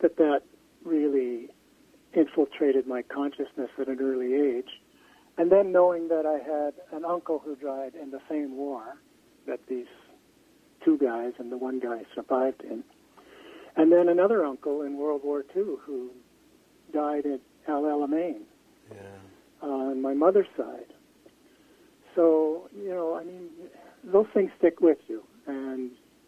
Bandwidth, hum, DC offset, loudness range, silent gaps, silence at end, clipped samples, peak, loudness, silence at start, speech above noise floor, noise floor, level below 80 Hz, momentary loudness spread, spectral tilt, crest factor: 8.4 kHz; none; under 0.1%; 6 LU; none; 0.4 s; under 0.1%; -6 dBFS; -27 LUFS; 0 s; 34 dB; -60 dBFS; -74 dBFS; 18 LU; -7.5 dB/octave; 22 dB